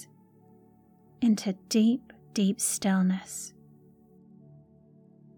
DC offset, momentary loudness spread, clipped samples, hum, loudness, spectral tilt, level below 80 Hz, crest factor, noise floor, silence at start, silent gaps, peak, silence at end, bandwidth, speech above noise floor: under 0.1%; 12 LU; under 0.1%; none; -28 LUFS; -5 dB/octave; -72 dBFS; 16 dB; -59 dBFS; 0 s; none; -14 dBFS; 1.9 s; 18.5 kHz; 33 dB